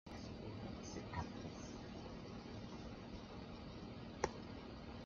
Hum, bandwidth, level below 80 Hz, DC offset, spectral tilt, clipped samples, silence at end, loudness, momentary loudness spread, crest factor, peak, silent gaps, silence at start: none; 7.4 kHz; -62 dBFS; under 0.1%; -5 dB/octave; under 0.1%; 0 s; -50 LUFS; 7 LU; 28 dB; -22 dBFS; none; 0.05 s